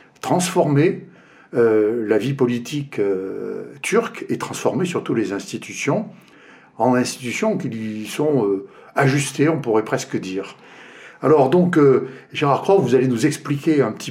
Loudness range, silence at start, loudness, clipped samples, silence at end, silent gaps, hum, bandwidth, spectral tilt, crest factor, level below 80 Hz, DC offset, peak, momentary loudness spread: 5 LU; 0.25 s; -20 LUFS; under 0.1%; 0 s; none; none; 16 kHz; -6 dB/octave; 16 dB; -68 dBFS; under 0.1%; -2 dBFS; 11 LU